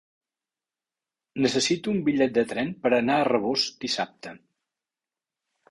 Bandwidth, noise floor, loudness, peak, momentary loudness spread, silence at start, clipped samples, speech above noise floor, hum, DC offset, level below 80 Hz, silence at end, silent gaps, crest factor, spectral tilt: 11.5 kHz; under -90 dBFS; -25 LUFS; -8 dBFS; 11 LU; 1.35 s; under 0.1%; over 65 dB; none; under 0.1%; -64 dBFS; 1.35 s; none; 18 dB; -4 dB/octave